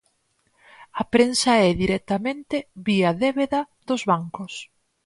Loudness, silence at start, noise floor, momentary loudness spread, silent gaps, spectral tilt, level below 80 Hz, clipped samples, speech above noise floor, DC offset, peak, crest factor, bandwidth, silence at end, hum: -22 LUFS; 0.8 s; -68 dBFS; 15 LU; none; -5 dB/octave; -50 dBFS; under 0.1%; 46 dB; under 0.1%; -4 dBFS; 18 dB; 11.5 kHz; 0.4 s; none